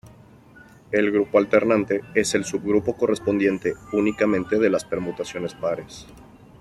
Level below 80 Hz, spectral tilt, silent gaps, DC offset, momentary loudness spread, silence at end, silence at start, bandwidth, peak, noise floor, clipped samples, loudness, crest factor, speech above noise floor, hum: -56 dBFS; -5 dB/octave; none; under 0.1%; 10 LU; 0.4 s; 0.05 s; 12.5 kHz; -4 dBFS; -49 dBFS; under 0.1%; -22 LUFS; 20 dB; 27 dB; none